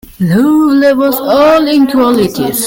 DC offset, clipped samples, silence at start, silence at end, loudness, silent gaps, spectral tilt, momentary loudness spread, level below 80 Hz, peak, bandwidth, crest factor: under 0.1%; under 0.1%; 0.2 s; 0 s; -9 LUFS; none; -5.5 dB/octave; 4 LU; -42 dBFS; 0 dBFS; 17 kHz; 8 dB